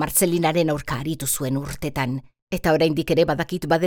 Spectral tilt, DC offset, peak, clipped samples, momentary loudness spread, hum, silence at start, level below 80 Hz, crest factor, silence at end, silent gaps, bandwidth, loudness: -4.5 dB/octave; under 0.1%; -6 dBFS; under 0.1%; 8 LU; none; 0 s; -44 dBFS; 16 dB; 0 s; 2.42-2.47 s; over 20 kHz; -22 LUFS